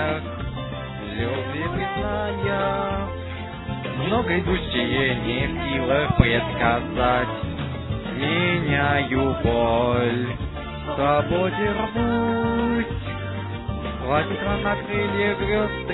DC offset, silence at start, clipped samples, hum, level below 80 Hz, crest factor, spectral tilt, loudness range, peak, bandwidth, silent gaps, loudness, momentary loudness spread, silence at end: under 0.1%; 0 s; under 0.1%; none; -38 dBFS; 22 dB; -10.5 dB/octave; 4 LU; 0 dBFS; 4.1 kHz; none; -23 LUFS; 10 LU; 0 s